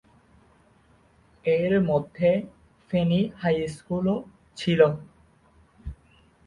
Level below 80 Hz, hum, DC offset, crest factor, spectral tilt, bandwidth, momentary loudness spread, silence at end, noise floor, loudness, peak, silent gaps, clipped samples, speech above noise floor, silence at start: -52 dBFS; none; under 0.1%; 20 dB; -7.5 dB/octave; 11 kHz; 22 LU; 0.55 s; -59 dBFS; -25 LUFS; -6 dBFS; none; under 0.1%; 36 dB; 1.45 s